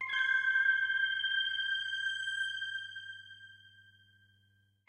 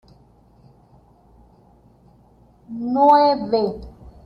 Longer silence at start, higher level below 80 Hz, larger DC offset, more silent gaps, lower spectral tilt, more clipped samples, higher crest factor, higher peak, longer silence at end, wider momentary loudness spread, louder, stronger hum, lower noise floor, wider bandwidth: second, 0 s vs 2.7 s; second, -88 dBFS vs -50 dBFS; neither; neither; second, 2 dB/octave vs -7.5 dB/octave; neither; about the same, 16 dB vs 20 dB; second, -20 dBFS vs -4 dBFS; first, 1.2 s vs 0.15 s; about the same, 19 LU vs 21 LU; second, -31 LUFS vs -18 LUFS; first, 50 Hz at -70 dBFS vs none; first, -71 dBFS vs -53 dBFS; first, 10 kHz vs 5.8 kHz